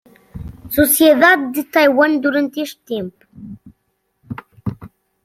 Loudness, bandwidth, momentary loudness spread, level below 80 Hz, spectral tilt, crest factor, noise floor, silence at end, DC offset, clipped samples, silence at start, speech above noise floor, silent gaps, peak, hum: -14 LUFS; 16.5 kHz; 24 LU; -46 dBFS; -4 dB/octave; 16 dB; -68 dBFS; 0.35 s; under 0.1%; under 0.1%; 0.35 s; 54 dB; none; 0 dBFS; none